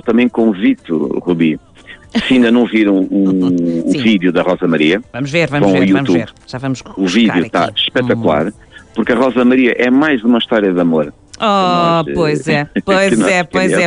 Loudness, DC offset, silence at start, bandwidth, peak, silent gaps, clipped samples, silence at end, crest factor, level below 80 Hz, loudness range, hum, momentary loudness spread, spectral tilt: -13 LUFS; under 0.1%; 0.05 s; 10.5 kHz; -2 dBFS; none; under 0.1%; 0 s; 10 dB; -46 dBFS; 1 LU; none; 7 LU; -6 dB/octave